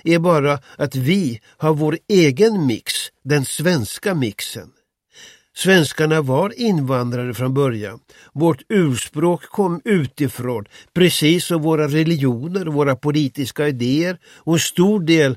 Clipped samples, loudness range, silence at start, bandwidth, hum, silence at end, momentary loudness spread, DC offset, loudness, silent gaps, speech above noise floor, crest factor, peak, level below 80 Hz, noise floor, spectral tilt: under 0.1%; 2 LU; 0.05 s; 16 kHz; none; 0 s; 9 LU; under 0.1%; -18 LUFS; none; 30 dB; 16 dB; -2 dBFS; -58 dBFS; -47 dBFS; -5.5 dB/octave